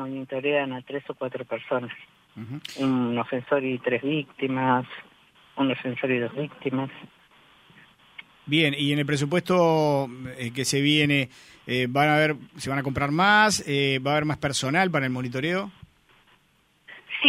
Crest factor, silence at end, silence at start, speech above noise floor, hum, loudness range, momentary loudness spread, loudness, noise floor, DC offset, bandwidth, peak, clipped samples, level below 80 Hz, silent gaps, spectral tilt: 24 dB; 0 s; 0 s; 39 dB; none; 7 LU; 14 LU; -25 LUFS; -64 dBFS; under 0.1%; 15.5 kHz; -2 dBFS; under 0.1%; -60 dBFS; none; -4.5 dB/octave